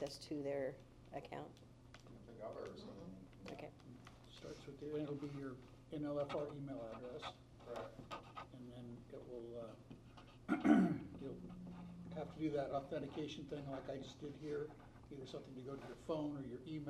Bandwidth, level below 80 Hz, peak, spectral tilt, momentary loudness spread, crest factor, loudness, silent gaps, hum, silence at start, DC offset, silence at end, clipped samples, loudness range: 12.5 kHz; -68 dBFS; -18 dBFS; -7 dB/octave; 16 LU; 28 dB; -46 LUFS; none; none; 0 s; under 0.1%; 0 s; under 0.1%; 13 LU